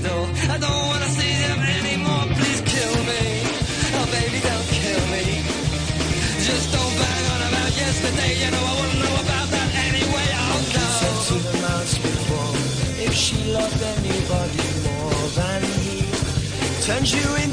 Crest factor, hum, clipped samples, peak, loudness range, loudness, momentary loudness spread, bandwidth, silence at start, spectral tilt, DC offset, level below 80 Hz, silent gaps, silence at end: 14 dB; none; under 0.1%; -8 dBFS; 2 LU; -21 LUFS; 3 LU; 10.5 kHz; 0 s; -4 dB/octave; under 0.1%; -34 dBFS; none; 0 s